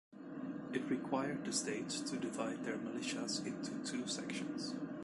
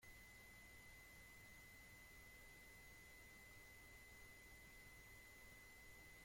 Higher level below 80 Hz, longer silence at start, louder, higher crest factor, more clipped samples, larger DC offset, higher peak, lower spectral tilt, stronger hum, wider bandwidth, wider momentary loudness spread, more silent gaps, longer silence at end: second, -78 dBFS vs -72 dBFS; about the same, 0.1 s vs 0 s; first, -41 LUFS vs -62 LUFS; first, 18 dB vs 12 dB; neither; neither; first, -22 dBFS vs -50 dBFS; about the same, -3.5 dB/octave vs -2.5 dB/octave; neither; second, 11.5 kHz vs 16.5 kHz; first, 5 LU vs 0 LU; neither; about the same, 0 s vs 0 s